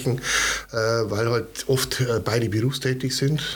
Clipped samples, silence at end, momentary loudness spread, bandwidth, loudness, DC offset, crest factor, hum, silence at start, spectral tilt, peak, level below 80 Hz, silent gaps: under 0.1%; 0 s; 3 LU; 19 kHz; -23 LUFS; under 0.1%; 16 dB; none; 0 s; -4 dB/octave; -6 dBFS; -48 dBFS; none